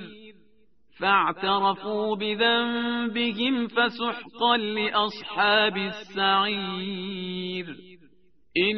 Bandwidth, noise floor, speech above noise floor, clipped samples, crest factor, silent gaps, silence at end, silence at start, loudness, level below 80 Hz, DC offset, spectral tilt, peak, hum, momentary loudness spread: 6 kHz; -65 dBFS; 40 dB; under 0.1%; 18 dB; none; 0 s; 0 s; -25 LUFS; -66 dBFS; 0.2%; -1 dB/octave; -8 dBFS; none; 10 LU